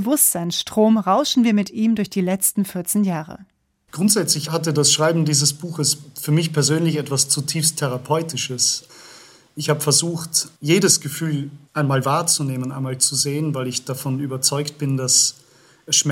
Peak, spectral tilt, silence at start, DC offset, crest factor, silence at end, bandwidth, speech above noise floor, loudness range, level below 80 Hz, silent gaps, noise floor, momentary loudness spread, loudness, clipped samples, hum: -2 dBFS; -3.5 dB/octave; 0 s; under 0.1%; 18 dB; 0 s; 16.5 kHz; 26 dB; 2 LU; -66 dBFS; none; -46 dBFS; 9 LU; -19 LUFS; under 0.1%; none